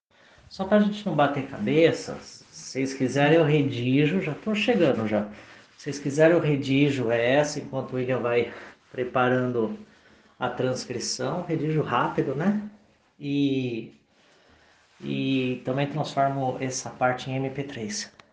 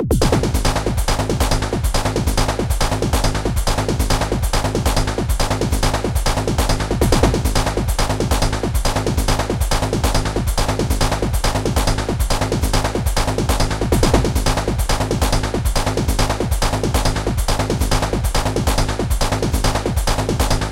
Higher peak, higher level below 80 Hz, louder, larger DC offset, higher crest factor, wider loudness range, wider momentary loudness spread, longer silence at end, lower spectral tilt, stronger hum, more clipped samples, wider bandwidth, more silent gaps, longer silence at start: second, -6 dBFS vs 0 dBFS; second, -64 dBFS vs -20 dBFS; second, -25 LUFS vs -19 LUFS; second, under 0.1% vs 0.6%; about the same, 20 dB vs 18 dB; first, 5 LU vs 1 LU; first, 14 LU vs 3 LU; first, 0.25 s vs 0 s; about the same, -5.5 dB/octave vs -4.5 dB/octave; neither; neither; second, 9.8 kHz vs 17 kHz; neither; first, 0.5 s vs 0 s